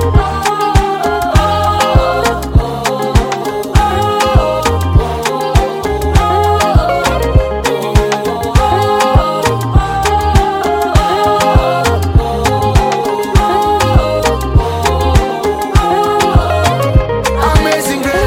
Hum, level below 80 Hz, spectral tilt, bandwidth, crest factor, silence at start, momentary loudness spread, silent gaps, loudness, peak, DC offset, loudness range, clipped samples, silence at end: none; -18 dBFS; -5.5 dB/octave; 17 kHz; 12 dB; 0 s; 4 LU; none; -12 LUFS; 0 dBFS; under 0.1%; 1 LU; under 0.1%; 0 s